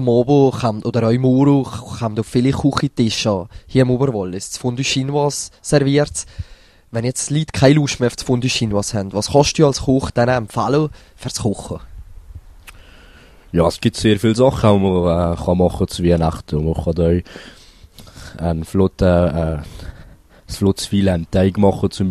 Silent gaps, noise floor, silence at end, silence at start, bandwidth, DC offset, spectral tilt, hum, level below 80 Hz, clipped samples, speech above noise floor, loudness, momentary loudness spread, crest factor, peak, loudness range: none; -44 dBFS; 0 s; 0 s; 13.5 kHz; under 0.1%; -6 dB/octave; none; -36 dBFS; under 0.1%; 27 dB; -17 LUFS; 12 LU; 18 dB; 0 dBFS; 5 LU